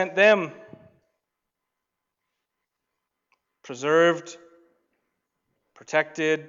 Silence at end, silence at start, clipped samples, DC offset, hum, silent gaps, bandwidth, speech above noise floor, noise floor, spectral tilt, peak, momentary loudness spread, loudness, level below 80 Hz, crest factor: 0.05 s; 0 s; under 0.1%; under 0.1%; none; none; 7.8 kHz; 61 dB; -83 dBFS; -4.5 dB/octave; -6 dBFS; 18 LU; -22 LUFS; -82 dBFS; 22 dB